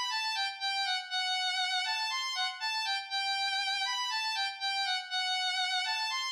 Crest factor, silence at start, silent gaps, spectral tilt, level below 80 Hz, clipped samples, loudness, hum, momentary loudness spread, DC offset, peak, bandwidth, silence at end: 12 dB; 0 s; none; 9 dB/octave; under -90 dBFS; under 0.1%; -31 LUFS; none; 2 LU; under 0.1%; -20 dBFS; 15.5 kHz; 0 s